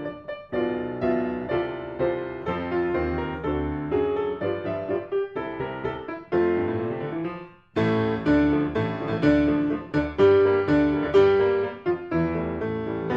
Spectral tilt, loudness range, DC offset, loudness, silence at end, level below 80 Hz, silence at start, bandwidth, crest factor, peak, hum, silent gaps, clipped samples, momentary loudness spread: -8.5 dB/octave; 6 LU; under 0.1%; -25 LUFS; 0 s; -44 dBFS; 0 s; 7 kHz; 16 dB; -8 dBFS; none; none; under 0.1%; 11 LU